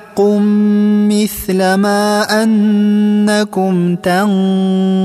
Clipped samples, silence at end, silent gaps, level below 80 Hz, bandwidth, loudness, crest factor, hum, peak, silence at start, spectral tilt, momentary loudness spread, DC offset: under 0.1%; 0 s; none; -46 dBFS; 15 kHz; -12 LUFS; 10 dB; none; -2 dBFS; 0 s; -6 dB/octave; 3 LU; under 0.1%